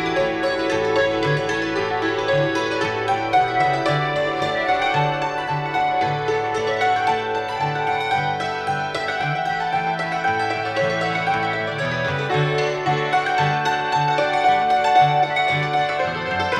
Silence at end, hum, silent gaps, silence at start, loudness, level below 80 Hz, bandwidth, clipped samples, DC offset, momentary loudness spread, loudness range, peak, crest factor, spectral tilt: 0 s; none; none; 0 s; -20 LUFS; -52 dBFS; 11 kHz; under 0.1%; under 0.1%; 5 LU; 3 LU; -6 dBFS; 14 dB; -5 dB/octave